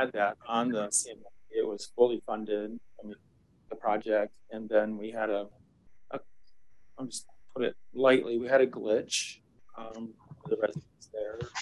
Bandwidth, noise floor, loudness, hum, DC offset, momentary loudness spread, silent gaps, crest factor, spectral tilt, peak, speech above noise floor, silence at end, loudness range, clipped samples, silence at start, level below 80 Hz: 12.5 kHz; -70 dBFS; -31 LUFS; none; under 0.1%; 19 LU; none; 22 dB; -3.5 dB/octave; -10 dBFS; 39 dB; 0 s; 5 LU; under 0.1%; 0 s; -70 dBFS